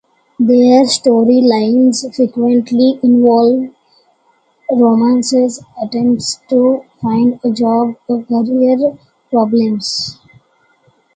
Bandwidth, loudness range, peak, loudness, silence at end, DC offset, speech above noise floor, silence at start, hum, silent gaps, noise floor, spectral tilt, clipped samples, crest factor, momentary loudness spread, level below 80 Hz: 9.2 kHz; 4 LU; 0 dBFS; -12 LUFS; 1 s; under 0.1%; 44 dB; 0.4 s; none; none; -56 dBFS; -5 dB/octave; under 0.1%; 12 dB; 9 LU; -58 dBFS